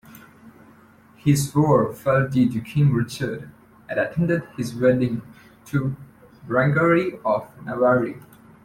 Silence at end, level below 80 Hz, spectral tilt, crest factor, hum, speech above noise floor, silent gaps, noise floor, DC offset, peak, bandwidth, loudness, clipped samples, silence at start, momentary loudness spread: 0.45 s; -54 dBFS; -7 dB/octave; 18 dB; none; 31 dB; none; -51 dBFS; under 0.1%; -4 dBFS; 15.5 kHz; -22 LUFS; under 0.1%; 0.15 s; 12 LU